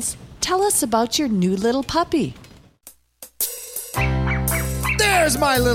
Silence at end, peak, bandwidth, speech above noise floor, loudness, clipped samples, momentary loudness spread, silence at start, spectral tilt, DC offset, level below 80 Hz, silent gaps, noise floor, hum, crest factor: 0 s; -4 dBFS; 17 kHz; 30 dB; -20 LUFS; under 0.1%; 9 LU; 0 s; -4 dB/octave; under 0.1%; -34 dBFS; none; -49 dBFS; none; 16 dB